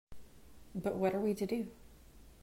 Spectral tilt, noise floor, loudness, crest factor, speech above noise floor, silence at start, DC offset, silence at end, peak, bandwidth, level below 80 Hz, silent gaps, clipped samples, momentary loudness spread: -7 dB/octave; -58 dBFS; -37 LUFS; 18 dB; 22 dB; 0.1 s; under 0.1%; 0.1 s; -20 dBFS; 16 kHz; -60 dBFS; none; under 0.1%; 12 LU